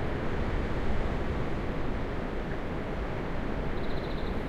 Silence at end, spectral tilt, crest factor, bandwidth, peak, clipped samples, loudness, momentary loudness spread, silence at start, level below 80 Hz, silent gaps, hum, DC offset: 0 s; -7.5 dB/octave; 12 dB; 7.4 kHz; -18 dBFS; under 0.1%; -34 LUFS; 2 LU; 0 s; -36 dBFS; none; none; under 0.1%